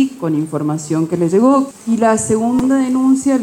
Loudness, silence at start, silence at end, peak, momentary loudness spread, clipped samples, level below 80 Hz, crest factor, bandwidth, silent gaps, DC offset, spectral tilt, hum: -15 LUFS; 0 s; 0 s; -2 dBFS; 7 LU; under 0.1%; -50 dBFS; 12 dB; 13.5 kHz; none; under 0.1%; -6.5 dB/octave; none